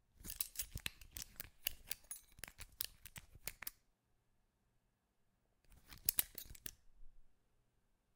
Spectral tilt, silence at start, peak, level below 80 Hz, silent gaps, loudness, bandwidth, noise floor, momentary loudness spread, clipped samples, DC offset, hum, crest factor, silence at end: -0.5 dB/octave; 0.15 s; -12 dBFS; -64 dBFS; none; -45 LUFS; 18 kHz; -81 dBFS; 16 LU; under 0.1%; under 0.1%; none; 38 dB; 0.85 s